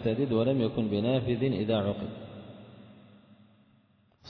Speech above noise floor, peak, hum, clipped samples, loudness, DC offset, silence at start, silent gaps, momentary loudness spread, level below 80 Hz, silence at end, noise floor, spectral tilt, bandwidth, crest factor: 37 dB; -16 dBFS; none; under 0.1%; -29 LUFS; under 0.1%; 0 s; none; 21 LU; -60 dBFS; 0 s; -65 dBFS; -10 dB/octave; 5.2 kHz; 16 dB